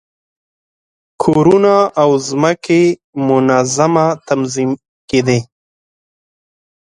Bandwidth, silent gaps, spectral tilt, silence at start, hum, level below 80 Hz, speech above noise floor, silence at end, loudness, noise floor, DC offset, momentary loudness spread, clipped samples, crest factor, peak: 11 kHz; 3.04-3.13 s, 4.88-5.08 s; -5.5 dB/octave; 1.2 s; none; -54 dBFS; over 78 dB; 1.4 s; -13 LUFS; under -90 dBFS; under 0.1%; 8 LU; under 0.1%; 14 dB; 0 dBFS